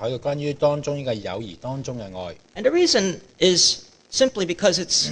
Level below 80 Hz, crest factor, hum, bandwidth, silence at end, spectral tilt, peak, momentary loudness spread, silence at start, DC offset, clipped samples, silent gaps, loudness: -54 dBFS; 20 dB; none; 10 kHz; 0 s; -3 dB/octave; -4 dBFS; 15 LU; 0 s; under 0.1%; under 0.1%; none; -21 LUFS